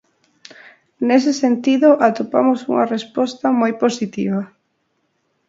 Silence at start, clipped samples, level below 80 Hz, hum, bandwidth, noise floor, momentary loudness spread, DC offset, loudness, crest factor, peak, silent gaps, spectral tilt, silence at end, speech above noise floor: 1 s; under 0.1%; -68 dBFS; none; 7.8 kHz; -68 dBFS; 9 LU; under 0.1%; -17 LUFS; 18 dB; 0 dBFS; none; -5.5 dB/octave; 1 s; 52 dB